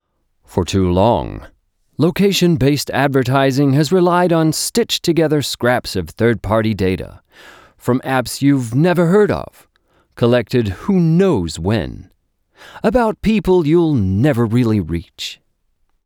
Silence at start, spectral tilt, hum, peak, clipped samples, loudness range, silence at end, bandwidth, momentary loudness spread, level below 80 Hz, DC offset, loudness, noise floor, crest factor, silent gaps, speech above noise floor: 0.5 s; -6 dB/octave; none; -4 dBFS; under 0.1%; 3 LU; 0.7 s; 19.5 kHz; 11 LU; -40 dBFS; under 0.1%; -16 LUFS; -63 dBFS; 12 dB; none; 48 dB